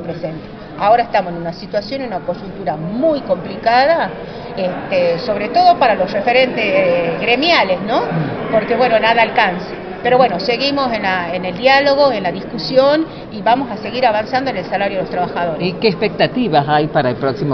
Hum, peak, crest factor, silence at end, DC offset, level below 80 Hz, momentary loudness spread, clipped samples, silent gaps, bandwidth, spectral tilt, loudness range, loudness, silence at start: none; 0 dBFS; 16 dB; 0 s; under 0.1%; -46 dBFS; 11 LU; under 0.1%; none; 6.4 kHz; -3 dB/octave; 4 LU; -15 LUFS; 0 s